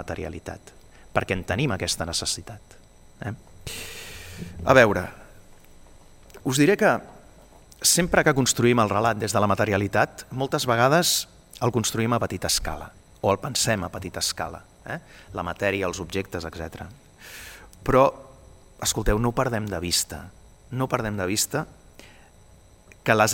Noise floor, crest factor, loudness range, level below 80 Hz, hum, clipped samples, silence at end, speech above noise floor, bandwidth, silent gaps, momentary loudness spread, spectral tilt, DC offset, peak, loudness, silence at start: -52 dBFS; 24 dB; 7 LU; -44 dBFS; none; under 0.1%; 0 s; 28 dB; 17 kHz; none; 19 LU; -3.5 dB/octave; under 0.1%; -2 dBFS; -23 LUFS; 0 s